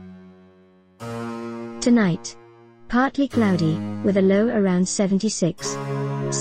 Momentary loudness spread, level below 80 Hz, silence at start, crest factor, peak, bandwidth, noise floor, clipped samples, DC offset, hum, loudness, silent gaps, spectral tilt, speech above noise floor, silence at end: 14 LU; -52 dBFS; 0 s; 16 dB; -6 dBFS; 10.5 kHz; -54 dBFS; under 0.1%; 0.3%; none; -22 LUFS; none; -5.5 dB/octave; 34 dB; 0 s